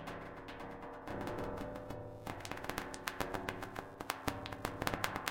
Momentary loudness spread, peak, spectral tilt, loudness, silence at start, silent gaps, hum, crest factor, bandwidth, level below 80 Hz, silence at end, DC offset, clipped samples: 9 LU; -12 dBFS; -4 dB/octave; -43 LUFS; 0 s; none; none; 30 dB; 17 kHz; -56 dBFS; 0 s; under 0.1%; under 0.1%